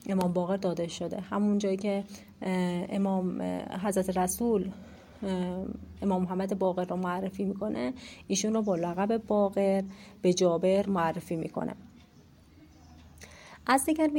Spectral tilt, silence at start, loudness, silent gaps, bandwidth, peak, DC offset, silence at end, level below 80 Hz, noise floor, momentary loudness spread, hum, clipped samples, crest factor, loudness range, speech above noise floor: -5.5 dB/octave; 0.05 s; -30 LUFS; none; 16.5 kHz; -10 dBFS; under 0.1%; 0 s; -60 dBFS; -57 dBFS; 12 LU; none; under 0.1%; 20 dB; 4 LU; 28 dB